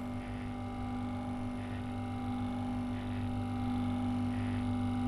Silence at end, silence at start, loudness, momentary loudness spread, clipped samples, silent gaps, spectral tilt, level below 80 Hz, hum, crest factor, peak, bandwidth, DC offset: 0 s; 0 s; -37 LUFS; 6 LU; under 0.1%; none; -8 dB/octave; -48 dBFS; none; 12 dB; -24 dBFS; 11.5 kHz; under 0.1%